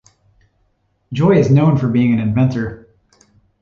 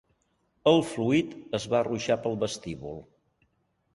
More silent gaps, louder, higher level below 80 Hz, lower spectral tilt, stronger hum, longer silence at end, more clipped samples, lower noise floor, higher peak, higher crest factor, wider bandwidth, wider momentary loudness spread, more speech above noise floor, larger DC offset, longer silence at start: neither; first, -15 LUFS vs -27 LUFS; first, -46 dBFS vs -60 dBFS; first, -9 dB/octave vs -5.5 dB/octave; neither; about the same, 0.85 s vs 0.9 s; neither; second, -63 dBFS vs -72 dBFS; first, -2 dBFS vs -8 dBFS; second, 14 dB vs 22 dB; second, 7.2 kHz vs 11.5 kHz; about the same, 13 LU vs 15 LU; first, 50 dB vs 45 dB; neither; first, 1.1 s vs 0.65 s